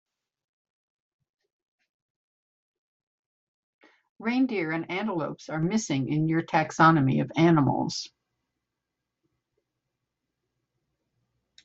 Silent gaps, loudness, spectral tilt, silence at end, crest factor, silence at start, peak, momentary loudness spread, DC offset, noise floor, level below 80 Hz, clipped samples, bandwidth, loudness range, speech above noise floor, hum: none; -25 LUFS; -5.5 dB/octave; 3.55 s; 22 dB; 4.2 s; -8 dBFS; 12 LU; under 0.1%; -85 dBFS; -66 dBFS; under 0.1%; 8 kHz; 10 LU; 61 dB; none